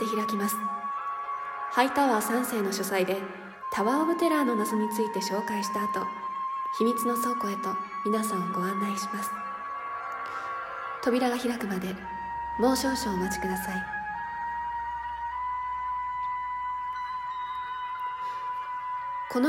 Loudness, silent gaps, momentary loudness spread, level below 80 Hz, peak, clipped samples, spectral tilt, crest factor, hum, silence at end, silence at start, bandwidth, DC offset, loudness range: -30 LUFS; none; 9 LU; -58 dBFS; -10 dBFS; under 0.1%; -4.5 dB/octave; 20 dB; none; 0 s; 0 s; 16.5 kHz; under 0.1%; 5 LU